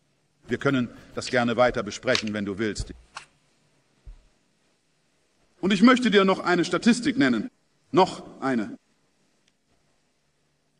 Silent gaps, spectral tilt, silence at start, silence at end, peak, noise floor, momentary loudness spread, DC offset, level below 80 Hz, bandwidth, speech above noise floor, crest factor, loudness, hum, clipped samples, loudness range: none; -5 dB/octave; 0.5 s; 2.05 s; -4 dBFS; -71 dBFS; 17 LU; under 0.1%; -52 dBFS; 10.5 kHz; 48 dB; 22 dB; -23 LUFS; none; under 0.1%; 10 LU